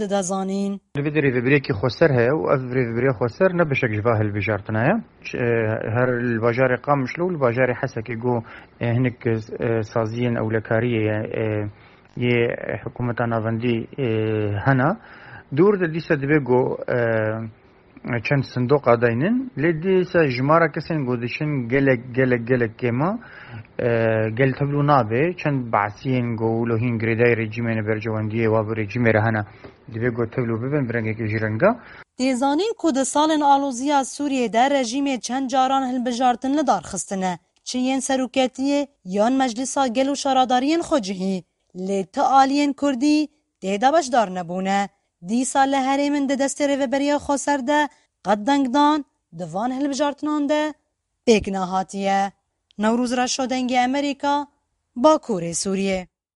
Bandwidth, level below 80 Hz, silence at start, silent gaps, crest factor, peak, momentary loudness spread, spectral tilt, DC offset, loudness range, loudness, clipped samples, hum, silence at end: 11.5 kHz; -54 dBFS; 0 s; none; 20 dB; -2 dBFS; 9 LU; -5.5 dB/octave; under 0.1%; 3 LU; -21 LUFS; under 0.1%; none; 0.3 s